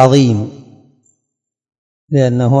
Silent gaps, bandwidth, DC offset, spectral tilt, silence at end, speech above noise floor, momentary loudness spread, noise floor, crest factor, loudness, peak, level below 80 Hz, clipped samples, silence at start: 1.78-2.08 s; 9.4 kHz; under 0.1%; -7.5 dB/octave; 0 s; 66 dB; 10 LU; -76 dBFS; 14 dB; -13 LUFS; 0 dBFS; -58 dBFS; 0.4%; 0 s